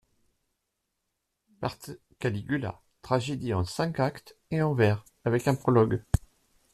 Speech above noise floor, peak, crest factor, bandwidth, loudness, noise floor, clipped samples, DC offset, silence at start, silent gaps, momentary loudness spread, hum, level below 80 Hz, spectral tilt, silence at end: 54 dB; -8 dBFS; 22 dB; 14 kHz; -29 LUFS; -81 dBFS; under 0.1%; under 0.1%; 1.6 s; none; 12 LU; none; -46 dBFS; -7 dB/octave; 0.55 s